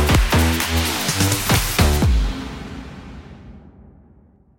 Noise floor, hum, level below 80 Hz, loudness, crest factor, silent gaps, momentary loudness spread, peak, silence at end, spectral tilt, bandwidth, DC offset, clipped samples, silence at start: -51 dBFS; none; -24 dBFS; -18 LUFS; 16 dB; none; 20 LU; -2 dBFS; 0.9 s; -4 dB/octave; 17 kHz; under 0.1%; under 0.1%; 0 s